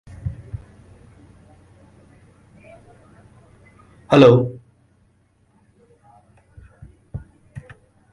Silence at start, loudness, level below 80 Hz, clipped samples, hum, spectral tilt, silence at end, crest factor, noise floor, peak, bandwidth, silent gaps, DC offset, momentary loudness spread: 0.25 s; -16 LUFS; -48 dBFS; under 0.1%; none; -8 dB/octave; 0.55 s; 22 dB; -60 dBFS; -2 dBFS; 10.5 kHz; none; under 0.1%; 30 LU